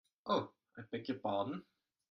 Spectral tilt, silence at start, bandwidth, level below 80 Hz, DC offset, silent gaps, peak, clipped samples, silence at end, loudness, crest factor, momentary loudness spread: -7 dB/octave; 0.25 s; 6.2 kHz; -80 dBFS; under 0.1%; none; -22 dBFS; under 0.1%; 0.5 s; -40 LUFS; 20 dB; 12 LU